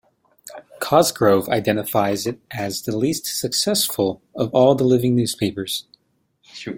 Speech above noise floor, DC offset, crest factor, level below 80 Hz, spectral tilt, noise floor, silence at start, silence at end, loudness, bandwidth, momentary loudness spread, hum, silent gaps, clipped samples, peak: 46 dB; under 0.1%; 18 dB; -58 dBFS; -4.5 dB/octave; -66 dBFS; 0.45 s; 0 s; -20 LUFS; 17 kHz; 12 LU; none; none; under 0.1%; -2 dBFS